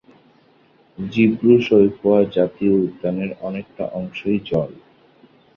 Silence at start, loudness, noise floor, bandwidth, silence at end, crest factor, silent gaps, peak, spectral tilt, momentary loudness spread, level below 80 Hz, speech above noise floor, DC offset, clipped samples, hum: 1 s; -19 LUFS; -55 dBFS; 6.6 kHz; 0.85 s; 18 dB; none; -2 dBFS; -9 dB/octave; 14 LU; -54 dBFS; 37 dB; under 0.1%; under 0.1%; none